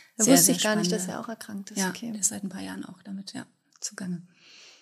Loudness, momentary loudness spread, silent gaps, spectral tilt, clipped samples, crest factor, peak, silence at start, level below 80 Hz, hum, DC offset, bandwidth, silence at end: -25 LUFS; 21 LU; none; -3 dB/octave; under 0.1%; 22 dB; -6 dBFS; 0.2 s; -78 dBFS; none; under 0.1%; 15 kHz; 0.1 s